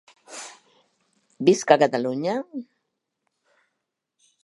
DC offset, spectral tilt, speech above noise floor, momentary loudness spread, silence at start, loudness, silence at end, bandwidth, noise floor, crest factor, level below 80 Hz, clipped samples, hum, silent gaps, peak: under 0.1%; -4.5 dB/octave; 60 dB; 21 LU; 0.3 s; -21 LUFS; 1.8 s; 11.5 kHz; -81 dBFS; 24 dB; -78 dBFS; under 0.1%; none; none; -2 dBFS